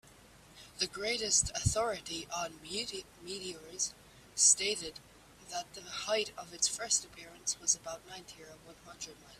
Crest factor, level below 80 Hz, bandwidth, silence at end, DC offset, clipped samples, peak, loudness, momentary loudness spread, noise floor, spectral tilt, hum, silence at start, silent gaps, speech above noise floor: 26 dB; -56 dBFS; 15.5 kHz; 0 s; under 0.1%; under 0.1%; -12 dBFS; -32 LUFS; 20 LU; -58 dBFS; -1 dB/octave; none; 0.05 s; none; 23 dB